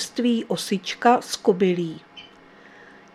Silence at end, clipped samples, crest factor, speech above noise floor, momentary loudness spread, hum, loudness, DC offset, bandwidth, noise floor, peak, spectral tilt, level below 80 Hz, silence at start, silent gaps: 0.9 s; under 0.1%; 22 dB; 27 dB; 20 LU; none; -22 LUFS; under 0.1%; 14.5 kHz; -49 dBFS; -2 dBFS; -4.5 dB/octave; -70 dBFS; 0 s; none